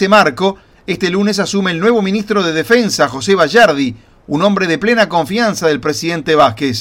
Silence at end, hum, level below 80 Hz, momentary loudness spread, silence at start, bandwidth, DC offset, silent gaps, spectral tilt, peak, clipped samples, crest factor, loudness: 0 s; none; -48 dBFS; 8 LU; 0 s; 16.5 kHz; under 0.1%; none; -4.5 dB/octave; 0 dBFS; under 0.1%; 12 dB; -13 LUFS